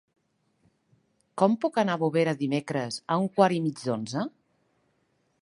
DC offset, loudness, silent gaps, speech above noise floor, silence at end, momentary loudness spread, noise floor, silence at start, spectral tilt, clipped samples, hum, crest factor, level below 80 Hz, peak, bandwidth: under 0.1%; -27 LUFS; none; 46 dB; 1.15 s; 9 LU; -72 dBFS; 1.35 s; -6 dB/octave; under 0.1%; none; 22 dB; -74 dBFS; -6 dBFS; 11.5 kHz